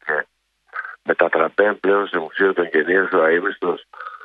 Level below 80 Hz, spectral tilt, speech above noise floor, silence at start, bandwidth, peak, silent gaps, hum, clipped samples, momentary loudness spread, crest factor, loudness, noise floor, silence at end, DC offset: -70 dBFS; -7.5 dB/octave; 40 dB; 0.05 s; 4.7 kHz; 0 dBFS; none; none; under 0.1%; 15 LU; 18 dB; -19 LUFS; -59 dBFS; 0.05 s; under 0.1%